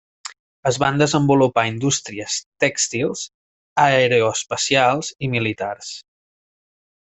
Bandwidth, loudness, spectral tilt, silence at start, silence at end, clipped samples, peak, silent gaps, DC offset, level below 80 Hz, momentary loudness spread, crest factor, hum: 8.4 kHz; -19 LUFS; -4 dB/octave; 0.25 s; 1.15 s; under 0.1%; -2 dBFS; 0.39-0.63 s, 2.46-2.52 s, 3.34-3.76 s; under 0.1%; -56 dBFS; 16 LU; 18 dB; none